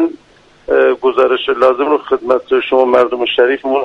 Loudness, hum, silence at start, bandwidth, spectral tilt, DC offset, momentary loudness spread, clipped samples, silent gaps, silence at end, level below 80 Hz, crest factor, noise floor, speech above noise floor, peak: -13 LUFS; none; 0 s; 6 kHz; -5 dB/octave; under 0.1%; 4 LU; under 0.1%; none; 0 s; -50 dBFS; 12 dB; -47 dBFS; 34 dB; 0 dBFS